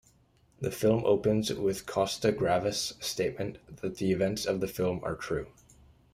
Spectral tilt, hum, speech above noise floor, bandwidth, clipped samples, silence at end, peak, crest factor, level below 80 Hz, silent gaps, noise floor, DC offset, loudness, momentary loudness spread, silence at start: -5 dB/octave; none; 35 dB; 16 kHz; under 0.1%; 0.65 s; -12 dBFS; 18 dB; -56 dBFS; none; -65 dBFS; under 0.1%; -30 LUFS; 11 LU; 0.6 s